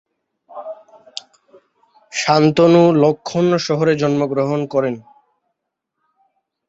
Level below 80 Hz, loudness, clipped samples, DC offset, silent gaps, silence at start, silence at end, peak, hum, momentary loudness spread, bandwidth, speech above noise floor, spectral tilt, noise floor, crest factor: -60 dBFS; -16 LUFS; under 0.1%; under 0.1%; none; 0.5 s; 1.7 s; -2 dBFS; none; 22 LU; 8 kHz; 63 dB; -6 dB/octave; -77 dBFS; 16 dB